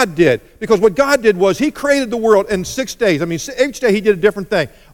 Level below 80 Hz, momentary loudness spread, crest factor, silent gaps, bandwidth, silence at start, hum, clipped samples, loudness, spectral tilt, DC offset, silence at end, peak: -44 dBFS; 7 LU; 14 dB; none; 17.5 kHz; 0 s; none; under 0.1%; -15 LUFS; -5 dB/octave; under 0.1%; 0.25 s; 0 dBFS